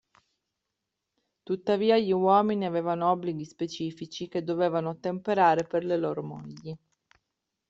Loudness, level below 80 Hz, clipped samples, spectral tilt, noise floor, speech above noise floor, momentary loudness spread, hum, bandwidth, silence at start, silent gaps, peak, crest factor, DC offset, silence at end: -27 LUFS; -70 dBFS; under 0.1%; -6.5 dB/octave; -85 dBFS; 58 dB; 16 LU; none; 7.8 kHz; 1.5 s; none; -10 dBFS; 20 dB; under 0.1%; 0.95 s